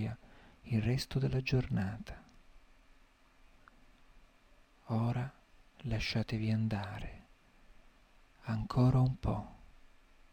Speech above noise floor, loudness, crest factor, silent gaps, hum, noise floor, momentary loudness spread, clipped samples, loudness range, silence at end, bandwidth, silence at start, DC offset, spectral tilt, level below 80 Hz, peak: 31 dB; -35 LUFS; 18 dB; none; none; -64 dBFS; 19 LU; under 0.1%; 7 LU; 0.65 s; 14.5 kHz; 0 s; under 0.1%; -7 dB/octave; -52 dBFS; -18 dBFS